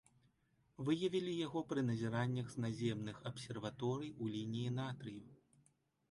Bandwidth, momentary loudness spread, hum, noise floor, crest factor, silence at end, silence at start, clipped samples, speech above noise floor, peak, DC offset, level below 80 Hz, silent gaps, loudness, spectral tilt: 11.5 kHz; 8 LU; none; -77 dBFS; 18 dB; 0.75 s; 0.8 s; under 0.1%; 37 dB; -24 dBFS; under 0.1%; -74 dBFS; none; -42 LUFS; -6.5 dB/octave